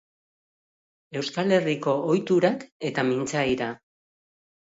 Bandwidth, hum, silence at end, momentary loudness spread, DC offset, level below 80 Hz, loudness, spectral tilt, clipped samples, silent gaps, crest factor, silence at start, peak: 8 kHz; none; 0.95 s; 10 LU; under 0.1%; -62 dBFS; -25 LUFS; -5.5 dB/octave; under 0.1%; 2.72-2.80 s; 20 dB; 1.1 s; -6 dBFS